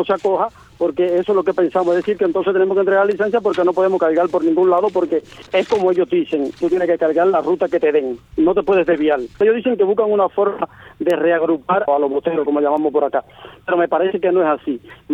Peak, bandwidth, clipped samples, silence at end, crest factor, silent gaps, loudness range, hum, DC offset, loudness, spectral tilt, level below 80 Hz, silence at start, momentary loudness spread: -4 dBFS; 8 kHz; under 0.1%; 0 s; 12 dB; none; 2 LU; none; under 0.1%; -17 LUFS; -7 dB/octave; -54 dBFS; 0 s; 6 LU